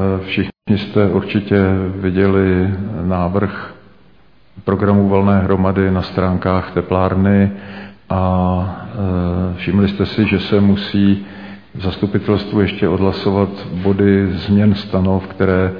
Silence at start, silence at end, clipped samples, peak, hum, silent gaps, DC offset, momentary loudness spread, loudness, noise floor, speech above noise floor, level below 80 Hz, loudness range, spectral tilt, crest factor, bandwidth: 0 s; 0 s; under 0.1%; -2 dBFS; none; none; 0.4%; 8 LU; -16 LUFS; -51 dBFS; 36 dB; -42 dBFS; 2 LU; -10 dB/octave; 14 dB; 5.2 kHz